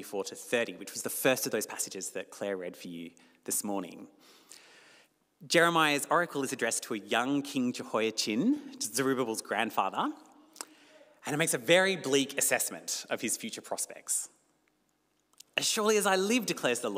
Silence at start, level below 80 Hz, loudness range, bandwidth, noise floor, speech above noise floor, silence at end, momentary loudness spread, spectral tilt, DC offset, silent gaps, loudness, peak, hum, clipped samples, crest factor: 0 s; -86 dBFS; 6 LU; 16 kHz; -75 dBFS; 44 dB; 0 s; 16 LU; -2.5 dB/octave; under 0.1%; none; -30 LUFS; -12 dBFS; none; under 0.1%; 20 dB